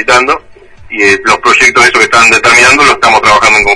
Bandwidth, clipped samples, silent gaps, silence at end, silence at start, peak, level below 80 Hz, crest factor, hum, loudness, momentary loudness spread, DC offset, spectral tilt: 11 kHz; 6%; none; 0 s; 0 s; 0 dBFS; -34 dBFS; 6 dB; none; -4 LUFS; 7 LU; under 0.1%; -1.5 dB/octave